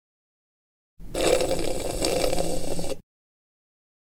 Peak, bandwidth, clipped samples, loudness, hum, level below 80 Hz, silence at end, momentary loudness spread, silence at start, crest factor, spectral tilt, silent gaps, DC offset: -6 dBFS; 18 kHz; under 0.1%; -27 LUFS; none; -38 dBFS; 1 s; 12 LU; 1 s; 20 dB; -3.5 dB/octave; none; under 0.1%